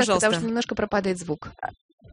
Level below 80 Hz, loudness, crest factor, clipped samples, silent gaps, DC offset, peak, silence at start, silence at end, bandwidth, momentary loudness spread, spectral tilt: -52 dBFS; -25 LUFS; 18 dB; under 0.1%; 1.81-1.98 s; under 0.1%; -6 dBFS; 0 s; 0 s; 10.5 kHz; 15 LU; -4 dB/octave